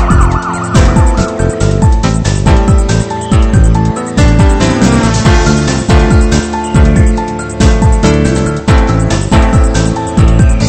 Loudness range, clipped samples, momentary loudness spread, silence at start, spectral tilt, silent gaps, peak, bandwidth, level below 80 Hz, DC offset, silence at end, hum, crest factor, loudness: 1 LU; 1%; 4 LU; 0 s; -6 dB/octave; none; 0 dBFS; 8.8 kHz; -12 dBFS; under 0.1%; 0 s; none; 8 dB; -10 LUFS